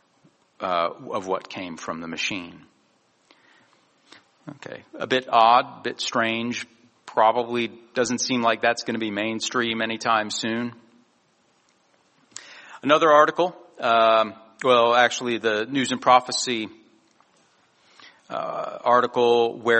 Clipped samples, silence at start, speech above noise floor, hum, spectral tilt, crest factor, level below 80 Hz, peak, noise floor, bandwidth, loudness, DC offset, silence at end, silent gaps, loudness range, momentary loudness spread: under 0.1%; 0.6 s; 42 dB; none; -3 dB/octave; 22 dB; -70 dBFS; -2 dBFS; -64 dBFS; 8.4 kHz; -22 LUFS; under 0.1%; 0 s; none; 10 LU; 17 LU